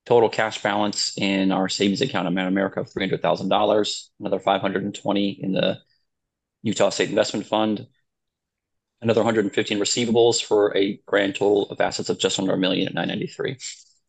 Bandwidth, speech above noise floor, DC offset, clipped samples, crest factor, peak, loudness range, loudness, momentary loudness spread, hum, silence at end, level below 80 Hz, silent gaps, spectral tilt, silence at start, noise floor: 9.2 kHz; 60 dB; under 0.1%; under 0.1%; 18 dB; -4 dBFS; 4 LU; -22 LUFS; 8 LU; none; 0.35 s; -64 dBFS; none; -4 dB/octave; 0.05 s; -82 dBFS